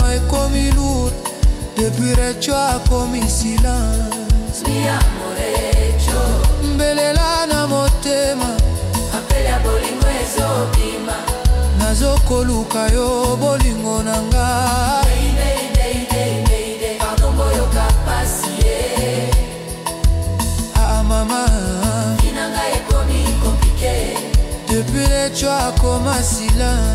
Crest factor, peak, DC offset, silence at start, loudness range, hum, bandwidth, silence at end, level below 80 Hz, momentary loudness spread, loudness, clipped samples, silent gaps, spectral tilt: 12 dB; -4 dBFS; under 0.1%; 0 s; 1 LU; none; 16 kHz; 0 s; -18 dBFS; 4 LU; -17 LUFS; under 0.1%; none; -4.5 dB/octave